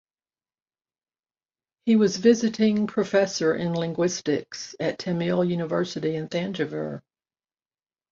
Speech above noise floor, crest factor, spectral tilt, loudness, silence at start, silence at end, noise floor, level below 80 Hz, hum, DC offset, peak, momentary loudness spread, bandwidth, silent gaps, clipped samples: over 66 dB; 20 dB; -5.5 dB/octave; -24 LUFS; 1.85 s; 1.1 s; under -90 dBFS; -66 dBFS; none; under 0.1%; -6 dBFS; 9 LU; 7.6 kHz; none; under 0.1%